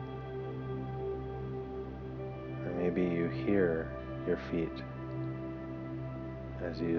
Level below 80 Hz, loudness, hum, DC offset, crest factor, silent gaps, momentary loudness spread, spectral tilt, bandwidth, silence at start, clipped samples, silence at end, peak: -52 dBFS; -37 LUFS; none; under 0.1%; 20 dB; none; 10 LU; -9.5 dB/octave; 6.2 kHz; 0 s; under 0.1%; 0 s; -16 dBFS